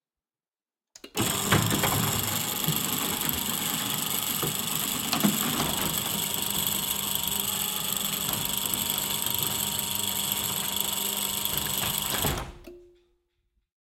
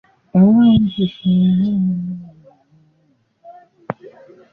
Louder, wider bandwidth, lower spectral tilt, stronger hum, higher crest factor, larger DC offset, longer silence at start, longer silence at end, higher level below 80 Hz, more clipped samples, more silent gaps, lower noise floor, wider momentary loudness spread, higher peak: second, -26 LUFS vs -15 LUFS; first, 17 kHz vs 4 kHz; second, -2 dB/octave vs -11 dB/octave; neither; first, 22 dB vs 14 dB; neither; first, 1.05 s vs 0.35 s; first, 1.15 s vs 0.45 s; second, -52 dBFS vs -46 dBFS; neither; neither; first, under -90 dBFS vs -60 dBFS; second, 3 LU vs 20 LU; second, -8 dBFS vs -2 dBFS